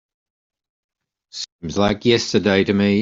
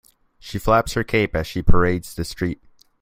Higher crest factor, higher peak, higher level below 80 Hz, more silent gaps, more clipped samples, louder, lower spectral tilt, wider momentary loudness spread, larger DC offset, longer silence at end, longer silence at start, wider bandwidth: about the same, 18 dB vs 18 dB; about the same, -2 dBFS vs -2 dBFS; second, -50 dBFS vs -28 dBFS; first, 1.52-1.59 s vs none; neither; first, -18 LUFS vs -22 LUFS; about the same, -5 dB/octave vs -6 dB/octave; about the same, 14 LU vs 13 LU; neither; second, 0 s vs 0.45 s; first, 1.35 s vs 0.45 s; second, 7.8 kHz vs 16 kHz